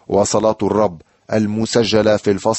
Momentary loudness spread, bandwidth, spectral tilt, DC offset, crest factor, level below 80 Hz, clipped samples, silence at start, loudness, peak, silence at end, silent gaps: 6 LU; 8.6 kHz; -5 dB/octave; under 0.1%; 14 dB; -48 dBFS; under 0.1%; 0.1 s; -17 LUFS; -2 dBFS; 0 s; none